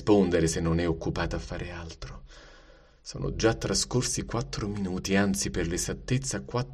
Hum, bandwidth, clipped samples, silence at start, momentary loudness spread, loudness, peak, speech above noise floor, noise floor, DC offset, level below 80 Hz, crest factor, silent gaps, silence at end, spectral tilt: none; 13.5 kHz; under 0.1%; 0 s; 15 LU; -28 LUFS; -10 dBFS; 26 dB; -55 dBFS; under 0.1%; -42 dBFS; 18 dB; none; 0 s; -4.5 dB/octave